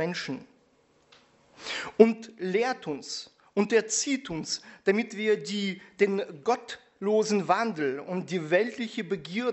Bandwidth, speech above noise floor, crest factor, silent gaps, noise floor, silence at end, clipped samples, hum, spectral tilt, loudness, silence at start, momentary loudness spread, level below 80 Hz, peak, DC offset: 8.2 kHz; 37 dB; 26 dB; none; -65 dBFS; 0 s; under 0.1%; none; -4 dB/octave; -28 LUFS; 0 s; 10 LU; -70 dBFS; -2 dBFS; under 0.1%